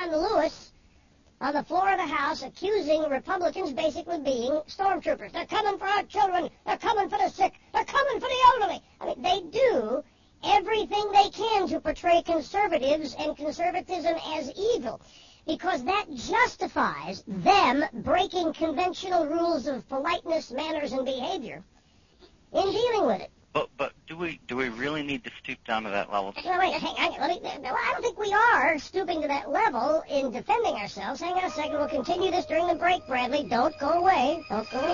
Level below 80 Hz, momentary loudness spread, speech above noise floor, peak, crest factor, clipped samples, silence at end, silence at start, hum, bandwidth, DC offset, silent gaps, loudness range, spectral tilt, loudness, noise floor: -56 dBFS; 10 LU; 33 dB; -8 dBFS; 20 dB; under 0.1%; 0 s; 0 s; none; 7.4 kHz; under 0.1%; none; 5 LU; -4 dB/octave; -27 LUFS; -60 dBFS